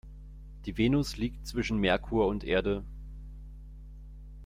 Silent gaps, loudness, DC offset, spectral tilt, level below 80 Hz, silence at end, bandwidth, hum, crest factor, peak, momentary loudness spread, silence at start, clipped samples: none; -30 LUFS; under 0.1%; -6 dB/octave; -42 dBFS; 0 s; 16 kHz; 50 Hz at -40 dBFS; 18 dB; -14 dBFS; 22 LU; 0.05 s; under 0.1%